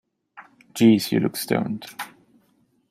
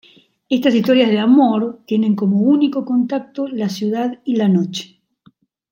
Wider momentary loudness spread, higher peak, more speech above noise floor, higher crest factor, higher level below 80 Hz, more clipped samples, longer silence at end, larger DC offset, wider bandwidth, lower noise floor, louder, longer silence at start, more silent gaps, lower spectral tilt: first, 20 LU vs 9 LU; about the same, -4 dBFS vs -2 dBFS; first, 44 dB vs 39 dB; first, 20 dB vs 14 dB; about the same, -64 dBFS vs -68 dBFS; neither; about the same, 0.85 s vs 0.85 s; neither; about the same, 16 kHz vs 16.5 kHz; first, -64 dBFS vs -54 dBFS; second, -21 LUFS vs -16 LUFS; second, 0.35 s vs 0.5 s; neither; second, -5.5 dB/octave vs -7 dB/octave